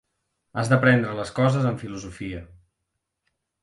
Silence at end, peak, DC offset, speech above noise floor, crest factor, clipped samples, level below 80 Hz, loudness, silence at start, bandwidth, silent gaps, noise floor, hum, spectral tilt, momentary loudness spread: 1.15 s; -4 dBFS; under 0.1%; 57 dB; 20 dB; under 0.1%; -52 dBFS; -22 LUFS; 0.55 s; 11.5 kHz; none; -80 dBFS; none; -7 dB/octave; 17 LU